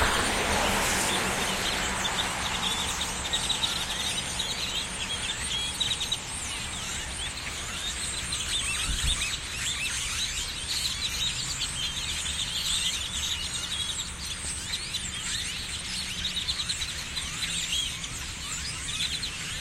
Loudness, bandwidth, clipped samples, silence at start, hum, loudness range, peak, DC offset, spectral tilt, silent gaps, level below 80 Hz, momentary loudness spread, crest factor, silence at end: -28 LUFS; 16.5 kHz; under 0.1%; 0 s; none; 3 LU; -10 dBFS; under 0.1%; -1 dB/octave; none; -42 dBFS; 6 LU; 20 dB; 0 s